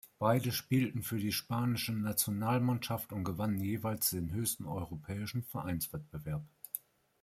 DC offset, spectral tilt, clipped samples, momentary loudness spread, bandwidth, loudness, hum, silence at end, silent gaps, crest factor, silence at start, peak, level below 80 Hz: under 0.1%; -5 dB/octave; under 0.1%; 10 LU; 16 kHz; -35 LUFS; none; 0.45 s; none; 20 dB; 0.05 s; -14 dBFS; -62 dBFS